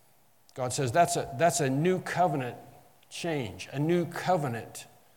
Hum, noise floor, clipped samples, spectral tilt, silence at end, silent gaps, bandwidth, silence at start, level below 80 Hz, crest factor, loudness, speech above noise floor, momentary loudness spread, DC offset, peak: none; -64 dBFS; under 0.1%; -5 dB/octave; 0.3 s; none; 18 kHz; 0.55 s; -66 dBFS; 20 dB; -29 LUFS; 36 dB; 16 LU; under 0.1%; -10 dBFS